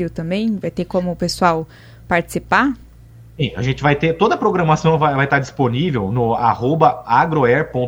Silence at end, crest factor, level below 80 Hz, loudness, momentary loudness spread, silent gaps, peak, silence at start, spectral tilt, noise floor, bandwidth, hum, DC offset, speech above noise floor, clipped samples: 0 s; 16 dB; -42 dBFS; -17 LUFS; 7 LU; none; 0 dBFS; 0 s; -6.5 dB/octave; -42 dBFS; 15.5 kHz; none; under 0.1%; 25 dB; under 0.1%